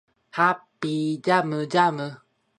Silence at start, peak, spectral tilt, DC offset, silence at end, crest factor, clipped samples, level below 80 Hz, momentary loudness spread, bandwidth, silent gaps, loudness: 0.35 s; -4 dBFS; -6 dB/octave; under 0.1%; 0.45 s; 22 dB; under 0.1%; -74 dBFS; 12 LU; 11.5 kHz; none; -24 LUFS